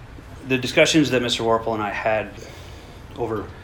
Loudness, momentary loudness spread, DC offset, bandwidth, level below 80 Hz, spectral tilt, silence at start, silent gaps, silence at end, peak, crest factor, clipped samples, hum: -21 LUFS; 23 LU; under 0.1%; 19 kHz; -46 dBFS; -4 dB/octave; 0 s; none; 0 s; -2 dBFS; 20 dB; under 0.1%; none